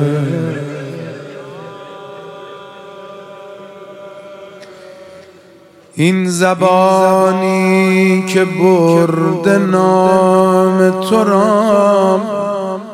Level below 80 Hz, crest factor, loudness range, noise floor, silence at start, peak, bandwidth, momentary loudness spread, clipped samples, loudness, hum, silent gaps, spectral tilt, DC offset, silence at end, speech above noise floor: -60 dBFS; 14 dB; 21 LU; -43 dBFS; 0 s; 0 dBFS; 14.5 kHz; 23 LU; under 0.1%; -12 LUFS; none; none; -6.5 dB/octave; under 0.1%; 0 s; 32 dB